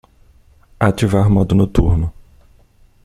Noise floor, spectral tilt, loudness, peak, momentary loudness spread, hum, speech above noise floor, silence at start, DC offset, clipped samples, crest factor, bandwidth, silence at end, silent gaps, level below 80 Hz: -50 dBFS; -8 dB/octave; -16 LUFS; -2 dBFS; 6 LU; none; 36 dB; 0.8 s; under 0.1%; under 0.1%; 14 dB; 12.5 kHz; 0.95 s; none; -28 dBFS